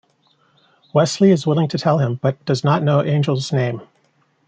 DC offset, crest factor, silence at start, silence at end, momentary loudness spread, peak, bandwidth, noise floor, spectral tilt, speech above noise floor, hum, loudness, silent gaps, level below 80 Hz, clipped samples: under 0.1%; 16 dB; 0.95 s; 0.65 s; 7 LU; -2 dBFS; 9.2 kHz; -61 dBFS; -6.5 dB/octave; 44 dB; none; -18 LUFS; none; -62 dBFS; under 0.1%